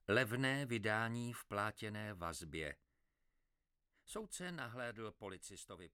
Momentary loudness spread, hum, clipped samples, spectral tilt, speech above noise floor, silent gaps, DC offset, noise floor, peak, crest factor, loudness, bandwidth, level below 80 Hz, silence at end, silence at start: 14 LU; none; under 0.1%; -4.5 dB/octave; 43 dB; none; under 0.1%; -86 dBFS; -20 dBFS; 24 dB; -43 LUFS; 17 kHz; -68 dBFS; 0.05 s; 0.1 s